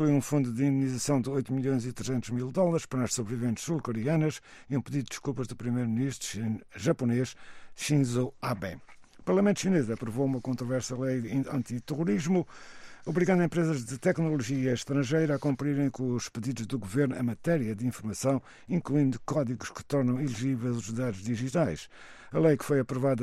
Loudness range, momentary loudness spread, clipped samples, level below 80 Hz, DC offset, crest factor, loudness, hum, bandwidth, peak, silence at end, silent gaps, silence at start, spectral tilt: 3 LU; 8 LU; under 0.1%; -60 dBFS; under 0.1%; 16 dB; -30 LUFS; none; 14.5 kHz; -12 dBFS; 0 s; none; 0 s; -6.5 dB/octave